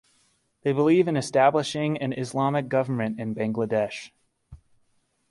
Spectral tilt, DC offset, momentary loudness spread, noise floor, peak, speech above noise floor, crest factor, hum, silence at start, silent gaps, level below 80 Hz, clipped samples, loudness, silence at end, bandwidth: -6.5 dB/octave; under 0.1%; 9 LU; -68 dBFS; -6 dBFS; 45 dB; 18 dB; none; 0.65 s; none; -62 dBFS; under 0.1%; -25 LUFS; 0.75 s; 11.5 kHz